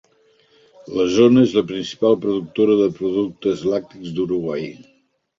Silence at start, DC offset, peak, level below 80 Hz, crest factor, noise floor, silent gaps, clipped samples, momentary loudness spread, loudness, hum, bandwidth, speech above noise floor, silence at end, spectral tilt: 0.85 s; under 0.1%; -2 dBFS; -56 dBFS; 18 dB; -57 dBFS; none; under 0.1%; 13 LU; -19 LUFS; none; 7.6 kHz; 39 dB; 0.55 s; -6.5 dB/octave